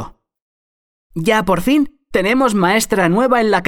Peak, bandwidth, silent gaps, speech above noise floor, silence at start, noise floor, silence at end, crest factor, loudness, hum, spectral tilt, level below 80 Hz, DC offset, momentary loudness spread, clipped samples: 0 dBFS; 18 kHz; 0.42-1.10 s; over 76 dB; 0 s; under -90 dBFS; 0 s; 16 dB; -15 LUFS; none; -5 dB/octave; -42 dBFS; under 0.1%; 7 LU; under 0.1%